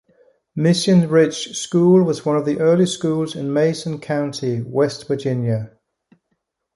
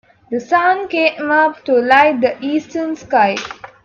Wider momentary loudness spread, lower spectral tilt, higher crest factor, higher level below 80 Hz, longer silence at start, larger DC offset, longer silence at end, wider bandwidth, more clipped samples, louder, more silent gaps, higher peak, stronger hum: about the same, 10 LU vs 12 LU; first, -6 dB/octave vs -4.5 dB/octave; about the same, 16 dB vs 16 dB; about the same, -60 dBFS vs -60 dBFS; first, 0.55 s vs 0.3 s; neither; first, 1.1 s vs 0.2 s; first, 11.5 kHz vs 7.6 kHz; neither; second, -18 LUFS vs -15 LUFS; neither; about the same, -2 dBFS vs 0 dBFS; neither